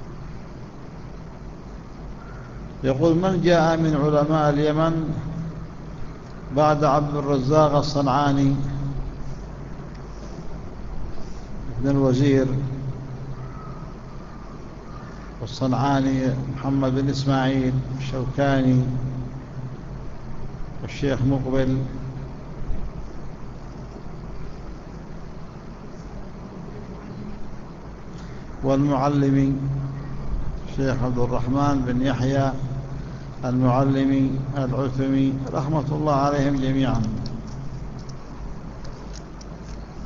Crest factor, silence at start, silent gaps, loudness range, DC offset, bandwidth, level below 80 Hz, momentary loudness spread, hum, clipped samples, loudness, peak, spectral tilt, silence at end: 20 dB; 0 s; none; 15 LU; under 0.1%; 7.4 kHz; -36 dBFS; 19 LU; none; under 0.1%; -22 LUFS; -4 dBFS; -7.5 dB/octave; 0 s